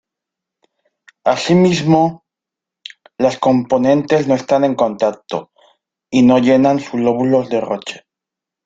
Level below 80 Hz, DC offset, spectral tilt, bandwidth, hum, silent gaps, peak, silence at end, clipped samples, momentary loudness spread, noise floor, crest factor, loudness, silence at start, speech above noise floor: -56 dBFS; under 0.1%; -6.5 dB/octave; 7.8 kHz; none; none; 0 dBFS; 0.7 s; under 0.1%; 14 LU; -85 dBFS; 16 dB; -15 LUFS; 1.25 s; 71 dB